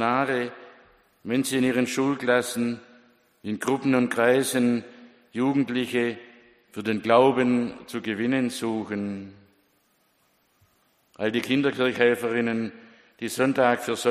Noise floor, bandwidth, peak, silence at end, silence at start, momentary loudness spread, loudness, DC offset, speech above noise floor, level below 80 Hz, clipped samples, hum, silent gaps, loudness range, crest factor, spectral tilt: -67 dBFS; 15.5 kHz; -4 dBFS; 0 s; 0 s; 13 LU; -24 LUFS; under 0.1%; 43 dB; -68 dBFS; under 0.1%; none; none; 6 LU; 22 dB; -5 dB/octave